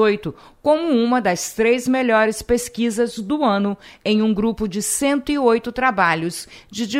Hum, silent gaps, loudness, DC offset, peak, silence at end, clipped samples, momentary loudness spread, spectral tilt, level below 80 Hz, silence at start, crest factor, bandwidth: none; none; -19 LUFS; under 0.1%; -2 dBFS; 0 s; under 0.1%; 8 LU; -4 dB/octave; -46 dBFS; 0 s; 16 dB; 16 kHz